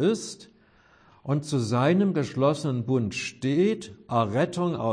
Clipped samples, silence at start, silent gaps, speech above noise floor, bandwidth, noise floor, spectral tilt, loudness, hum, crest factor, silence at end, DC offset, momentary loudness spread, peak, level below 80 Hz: under 0.1%; 0 s; none; 34 dB; 10.5 kHz; -59 dBFS; -6.5 dB/octave; -26 LUFS; none; 16 dB; 0 s; under 0.1%; 9 LU; -10 dBFS; -64 dBFS